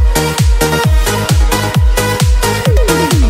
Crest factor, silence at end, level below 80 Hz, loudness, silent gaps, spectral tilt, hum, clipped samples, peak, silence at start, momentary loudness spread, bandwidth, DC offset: 10 dB; 0 s; -12 dBFS; -12 LUFS; none; -4.5 dB/octave; none; under 0.1%; 0 dBFS; 0 s; 1 LU; 16.5 kHz; under 0.1%